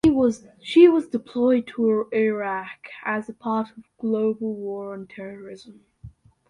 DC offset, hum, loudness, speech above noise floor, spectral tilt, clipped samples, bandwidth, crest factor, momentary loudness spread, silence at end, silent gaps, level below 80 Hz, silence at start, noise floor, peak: under 0.1%; none; -22 LUFS; 24 dB; -6.5 dB/octave; under 0.1%; 10.5 kHz; 20 dB; 21 LU; 0.4 s; none; -54 dBFS; 0.05 s; -47 dBFS; -4 dBFS